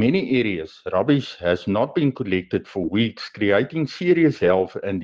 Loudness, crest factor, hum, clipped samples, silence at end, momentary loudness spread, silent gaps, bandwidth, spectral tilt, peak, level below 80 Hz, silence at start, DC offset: -21 LUFS; 16 dB; none; under 0.1%; 0 s; 7 LU; none; 7.4 kHz; -7.5 dB/octave; -4 dBFS; -56 dBFS; 0 s; under 0.1%